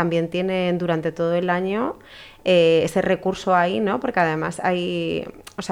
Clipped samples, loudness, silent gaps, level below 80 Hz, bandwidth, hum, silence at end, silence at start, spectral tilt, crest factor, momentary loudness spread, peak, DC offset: under 0.1%; -21 LUFS; none; -54 dBFS; 14 kHz; none; 0 s; 0 s; -6 dB/octave; 16 dB; 10 LU; -6 dBFS; under 0.1%